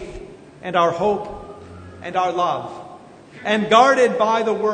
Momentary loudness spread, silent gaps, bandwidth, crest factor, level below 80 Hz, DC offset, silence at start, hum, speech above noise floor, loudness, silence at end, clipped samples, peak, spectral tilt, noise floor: 24 LU; none; 9.6 kHz; 20 dB; -50 dBFS; under 0.1%; 0 s; none; 23 dB; -18 LUFS; 0 s; under 0.1%; 0 dBFS; -4.5 dB/octave; -41 dBFS